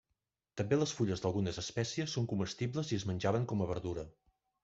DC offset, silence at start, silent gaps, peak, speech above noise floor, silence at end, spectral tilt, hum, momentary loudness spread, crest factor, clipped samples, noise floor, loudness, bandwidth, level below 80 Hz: under 0.1%; 0.55 s; none; -16 dBFS; 51 dB; 0.55 s; -5.5 dB/octave; none; 9 LU; 20 dB; under 0.1%; -86 dBFS; -36 LUFS; 8 kHz; -62 dBFS